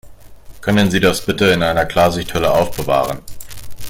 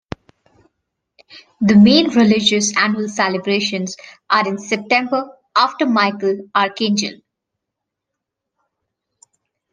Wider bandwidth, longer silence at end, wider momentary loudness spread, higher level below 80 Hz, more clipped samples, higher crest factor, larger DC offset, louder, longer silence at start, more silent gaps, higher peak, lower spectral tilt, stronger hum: first, 17 kHz vs 9.8 kHz; second, 0 s vs 2.55 s; first, 15 LU vs 12 LU; first, -38 dBFS vs -56 dBFS; neither; about the same, 16 dB vs 18 dB; neither; about the same, -16 LUFS vs -16 LUFS; second, 0.05 s vs 1.35 s; neither; about the same, -2 dBFS vs 0 dBFS; about the same, -5 dB/octave vs -4 dB/octave; neither